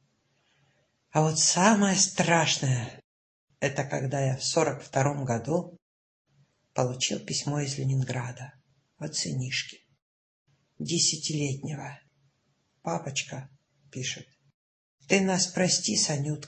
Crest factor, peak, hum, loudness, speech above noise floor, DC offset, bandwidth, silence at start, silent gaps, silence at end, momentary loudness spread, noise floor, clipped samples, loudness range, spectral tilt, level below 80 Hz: 22 dB; -6 dBFS; none; -27 LUFS; 45 dB; under 0.1%; 8.8 kHz; 1.15 s; 3.04-3.48 s, 5.82-6.25 s, 10.02-10.46 s, 14.54-14.98 s; 0 s; 17 LU; -73 dBFS; under 0.1%; 9 LU; -3.5 dB/octave; -66 dBFS